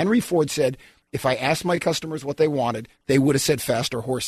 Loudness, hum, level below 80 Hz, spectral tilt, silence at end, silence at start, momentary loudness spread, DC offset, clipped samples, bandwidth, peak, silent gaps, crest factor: -22 LUFS; none; -54 dBFS; -5 dB/octave; 0 s; 0 s; 8 LU; under 0.1%; under 0.1%; 13.5 kHz; -6 dBFS; none; 16 dB